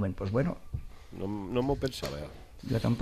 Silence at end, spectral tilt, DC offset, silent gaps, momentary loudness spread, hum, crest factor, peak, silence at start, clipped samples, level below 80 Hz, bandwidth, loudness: 0 s; -7 dB/octave; under 0.1%; none; 14 LU; none; 18 dB; -14 dBFS; 0 s; under 0.1%; -46 dBFS; 14 kHz; -33 LUFS